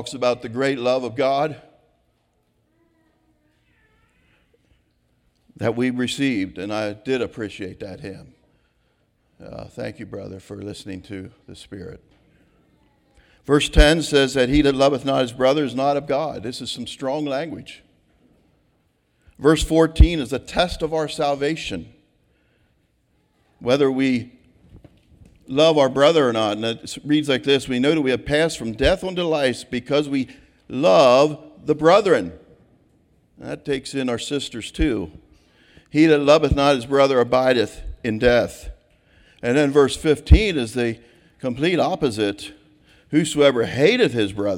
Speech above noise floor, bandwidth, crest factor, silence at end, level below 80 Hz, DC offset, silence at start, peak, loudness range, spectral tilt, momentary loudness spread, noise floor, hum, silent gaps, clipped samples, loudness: 47 dB; 16 kHz; 20 dB; 0 s; -32 dBFS; under 0.1%; 0 s; -2 dBFS; 13 LU; -5.5 dB/octave; 18 LU; -66 dBFS; none; none; under 0.1%; -20 LUFS